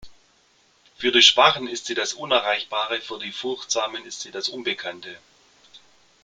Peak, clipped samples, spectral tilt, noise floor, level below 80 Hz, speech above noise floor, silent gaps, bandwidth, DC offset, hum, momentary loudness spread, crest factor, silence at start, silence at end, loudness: 0 dBFS; under 0.1%; -1 dB/octave; -60 dBFS; -64 dBFS; 37 dB; none; 9.6 kHz; under 0.1%; none; 18 LU; 24 dB; 0 s; 0.45 s; -21 LUFS